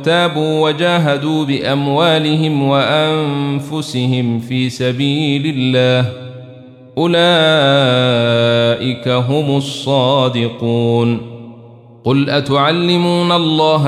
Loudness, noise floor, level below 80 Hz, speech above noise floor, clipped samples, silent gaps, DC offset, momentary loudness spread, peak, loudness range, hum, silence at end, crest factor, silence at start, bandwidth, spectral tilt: -14 LUFS; -39 dBFS; -58 dBFS; 25 dB; under 0.1%; none; under 0.1%; 7 LU; -2 dBFS; 3 LU; none; 0 s; 12 dB; 0 s; 13.5 kHz; -6 dB/octave